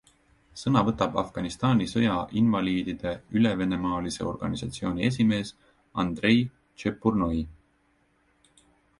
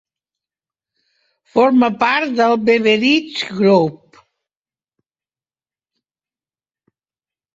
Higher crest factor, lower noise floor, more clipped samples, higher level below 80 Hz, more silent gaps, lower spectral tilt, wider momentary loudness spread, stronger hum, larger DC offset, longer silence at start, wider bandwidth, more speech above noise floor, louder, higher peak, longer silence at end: about the same, 20 dB vs 18 dB; second, -67 dBFS vs under -90 dBFS; neither; first, -50 dBFS vs -62 dBFS; neither; about the same, -6.5 dB/octave vs -5.5 dB/octave; first, 9 LU vs 6 LU; neither; neither; second, 0.55 s vs 1.55 s; first, 11.5 kHz vs 7.8 kHz; second, 41 dB vs over 76 dB; second, -27 LUFS vs -15 LUFS; second, -8 dBFS vs -2 dBFS; second, 1.45 s vs 3.6 s